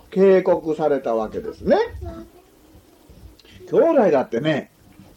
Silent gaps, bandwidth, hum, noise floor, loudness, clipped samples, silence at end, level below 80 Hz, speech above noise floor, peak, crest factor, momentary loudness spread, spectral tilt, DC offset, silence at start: none; 8.6 kHz; none; -50 dBFS; -19 LUFS; under 0.1%; 0.5 s; -46 dBFS; 32 dB; -6 dBFS; 16 dB; 13 LU; -7.5 dB/octave; under 0.1%; 0.1 s